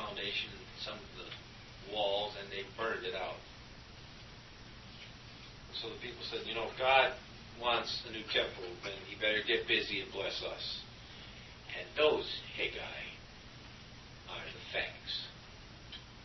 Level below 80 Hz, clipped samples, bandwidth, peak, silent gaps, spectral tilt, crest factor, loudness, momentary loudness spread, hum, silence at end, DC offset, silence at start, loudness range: -60 dBFS; under 0.1%; 6 kHz; -14 dBFS; none; -0.5 dB/octave; 26 dB; -36 LUFS; 21 LU; none; 0 s; under 0.1%; 0 s; 9 LU